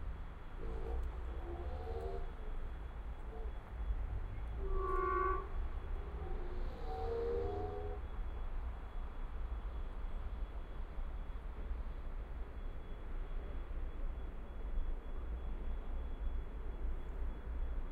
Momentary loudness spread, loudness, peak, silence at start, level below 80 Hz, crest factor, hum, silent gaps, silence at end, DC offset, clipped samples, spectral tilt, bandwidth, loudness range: 10 LU; -45 LUFS; -24 dBFS; 0 s; -42 dBFS; 16 dB; none; none; 0 s; under 0.1%; under 0.1%; -8.5 dB/octave; 4.7 kHz; 7 LU